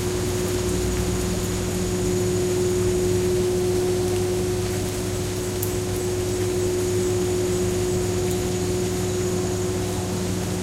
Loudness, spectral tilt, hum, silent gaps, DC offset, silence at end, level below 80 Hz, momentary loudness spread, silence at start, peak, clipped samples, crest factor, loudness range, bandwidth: -24 LUFS; -5 dB/octave; 60 Hz at -40 dBFS; none; under 0.1%; 0 s; -36 dBFS; 4 LU; 0 s; -4 dBFS; under 0.1%; 18 dB; 2 LU; 16 kHz